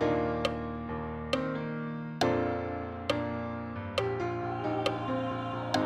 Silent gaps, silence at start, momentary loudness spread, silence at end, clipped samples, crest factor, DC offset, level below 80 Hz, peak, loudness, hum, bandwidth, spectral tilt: none; 0 s; 7 LU; 0 s; under 0.1%; 18 dB; under 0.1%; -52 dBFS; -14 dBFS; -33 LUFS; none; 15 kHz; -6 dB/octave